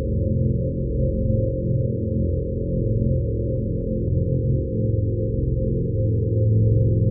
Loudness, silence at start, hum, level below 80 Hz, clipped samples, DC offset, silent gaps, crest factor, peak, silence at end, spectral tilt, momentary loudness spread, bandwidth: -23 LUFS; 0 s; none; -30 dBFS; under 0.1%; under 0.1%; none; 12 dB; -8 dBFS; 0 s; -21 dB/octave; 5 LU; 0.6 kHz